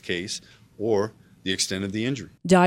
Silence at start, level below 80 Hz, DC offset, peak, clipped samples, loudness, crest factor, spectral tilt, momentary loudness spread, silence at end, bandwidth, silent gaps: 0.05 s; -58 dBFS; under 0.1%; -4 dBFS; under 0.1%; -27 LUFS; 20 dB; -4.5 dB/octave; 8 LU; 0 s; 16 kHz; none